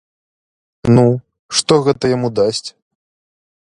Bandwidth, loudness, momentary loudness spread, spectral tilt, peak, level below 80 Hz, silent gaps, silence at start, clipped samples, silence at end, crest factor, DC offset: 11 kHz; -15 LUFS; 11 LU; -5.5 dB/octave; 0 dBFS; -46 dBFS; 1.39-1.49 s; 0.85 s; under 0.1%; 1 s; 16 dB; under 0.1%